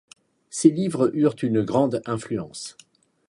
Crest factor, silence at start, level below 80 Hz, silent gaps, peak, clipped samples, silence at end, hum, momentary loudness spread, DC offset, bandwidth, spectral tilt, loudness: 22 dB; 0.55 s; -62 dBFS; none; -2 dBFS; under 0.1%; 0.6 s; none; 15 LU; under 0.1%; 11.5 kHz; -6 dB/octave; -23 LUFS